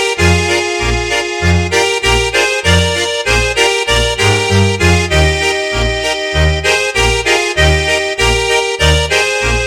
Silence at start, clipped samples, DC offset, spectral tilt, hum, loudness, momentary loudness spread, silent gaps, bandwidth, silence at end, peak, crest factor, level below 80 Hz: 0 s; under 0.1%; under 0.1%; -3.5 dB/octave; none; -11 LUFS; 4 LU; none; 16 kHz; 0 s; 0 dBFS; 12 dB; -22 dBFS